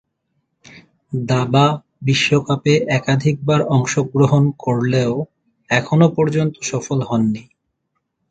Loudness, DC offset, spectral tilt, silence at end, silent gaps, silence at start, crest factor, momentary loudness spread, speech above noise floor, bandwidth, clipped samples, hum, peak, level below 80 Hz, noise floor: -17 LUFS; under 0.1%; -6 dB/octave; 0.9 s; none; 0.75 s; 18 dB; 8 LU; 57 dB; 8.8 kHz; under 0.1%; none; 0 dBFS; -52 dBFS; -73 dBFS